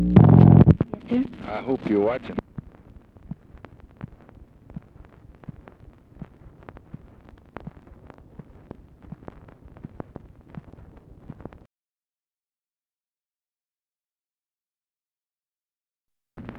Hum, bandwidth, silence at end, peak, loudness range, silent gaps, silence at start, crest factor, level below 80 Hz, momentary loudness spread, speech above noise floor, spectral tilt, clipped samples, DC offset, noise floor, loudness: none; 4.4 kHz; 0.05 s; 0 dBFS; 23 LU; none; 0 s; 24 dB; -42 dBFS; 31 LU; over 65 dB; -11.5 dB/octave; under 0.1%; under 0.1%; under -90 dBFS; -19 LUFS